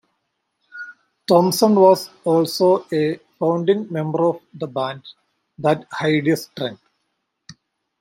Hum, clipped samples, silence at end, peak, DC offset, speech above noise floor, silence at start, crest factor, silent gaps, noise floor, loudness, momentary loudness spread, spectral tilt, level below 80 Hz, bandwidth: none; under 0.1%; 0.5 s; -2 dBFS; under 0.1%; 56 dB; 0.75 s; 18 dB; none; -74 dBFS; -19 LUFS; 16 LU; -5.5 dB/octave; -68 dBFS; 16.5 kHz